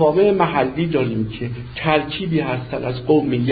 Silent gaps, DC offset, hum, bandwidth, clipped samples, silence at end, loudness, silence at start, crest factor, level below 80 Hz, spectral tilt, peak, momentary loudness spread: none; under 0.1%; none; 4.9 kHz; under 0.1%; 0 s; -20 LUFS; 0 s; 16 dB; -44 dBFS; -12 dB/octave; -2 dBFS; 9 LU